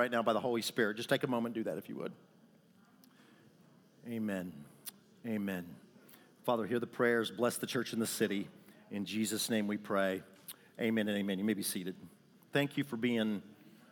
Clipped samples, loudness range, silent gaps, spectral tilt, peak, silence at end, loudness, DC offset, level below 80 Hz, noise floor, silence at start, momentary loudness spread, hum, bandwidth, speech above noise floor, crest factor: under 0.1%; 8 LU; none; -4.5 dB/octave; -16 dBFS; 0.2 s; -36 LUFS; under 0.1%; -86 dBFS; -65 dBFS; 0 s; 16 LU; none; over 20 kHz; 30 dB; 20 dB